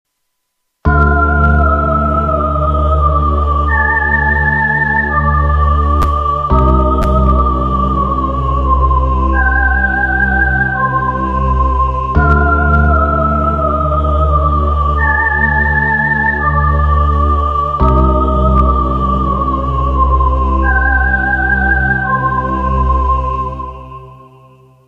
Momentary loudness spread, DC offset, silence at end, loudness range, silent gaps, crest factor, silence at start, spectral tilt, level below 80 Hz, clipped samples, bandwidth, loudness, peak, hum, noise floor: 4 LU; under 0.1%; 0.7 s; 1 LU; none; 12 dB; 0.85 s; -9 dB/octave; -16 dBFS; under 0.1%; 4.2 kHz; -12 LUFS; 0 dBFS; none; -69 dBFS